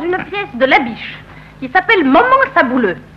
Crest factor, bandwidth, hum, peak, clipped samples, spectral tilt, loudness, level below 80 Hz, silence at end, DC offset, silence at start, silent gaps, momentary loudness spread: 12 dB; 6.8 kHz; none; -2 dBFS; under 0.1%; -6 dB/octave; -12 LUFS; -44 dBFS; 0.15 s; under 0.1%; 0 s; none; 18 LU